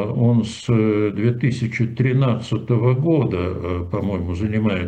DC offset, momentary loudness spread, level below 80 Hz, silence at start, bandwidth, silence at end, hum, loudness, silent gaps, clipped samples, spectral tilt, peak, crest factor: under 0.1%; 6 LU; -44 dBFS; 0 s; 8.8 kHz; 0 s; none; -20 LUFS; none; under 0.1%; -8 dB/octave; -8 dBFS; 12 dB